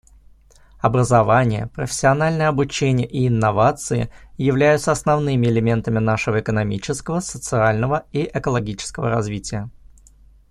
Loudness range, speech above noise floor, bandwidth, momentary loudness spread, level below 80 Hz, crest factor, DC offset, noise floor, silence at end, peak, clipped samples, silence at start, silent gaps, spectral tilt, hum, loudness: 4 LU; 30 dB; 12.5 kHz; 9 LU; -44 dBFS; 18 dB; under 0.1%; -49 dBFS; 0.8 s; -2 dBFS; under 0.1%; 0.85 s; none; -6 dB/octave; none; -19 LUFS